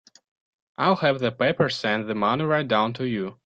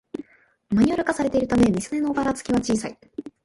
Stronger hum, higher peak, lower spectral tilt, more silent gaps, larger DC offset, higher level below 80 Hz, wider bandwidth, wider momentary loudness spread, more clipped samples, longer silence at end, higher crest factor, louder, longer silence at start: neither; second, -8 dBFS vs -4 dBFS; about the same, -6.5 dB/octave vs -6 dB/octave; neither; neither; second, -62 dBFS vs -48 dBFS; second, 8.8 kHz vs 11.5 kHz; second, 5 LU vs 18 LU; neither; about the same, 0.1 s vs 0.15 s; about the same, 16 dB vs 18 dB; about the same, -23 LUFS vs -22 LUFS; first, 0.8 s vs 0.2 s